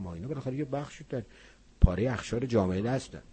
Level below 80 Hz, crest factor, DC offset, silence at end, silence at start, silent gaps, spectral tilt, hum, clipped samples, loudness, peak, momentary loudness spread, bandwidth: -36 dBFS; 26 dB; under 0.1%; 0.15 s; 0 s; none; -7 dB/octave; none; under 0.1%; -31 LUFS; -4 dBFS; 12 LU; 8.8 kHz